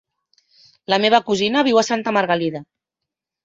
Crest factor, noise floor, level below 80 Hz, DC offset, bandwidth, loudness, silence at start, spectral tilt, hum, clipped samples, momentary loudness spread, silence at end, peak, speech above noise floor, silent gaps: 18 dB; -84 dBFS; -64 dBFS; under 0.1%; 8 kHz; -18 LUFS; 0.9 s; -4 dB/octave; none; under 0.1%; 11 LU; 0.8 s; -2 dBFS; 66 dB; none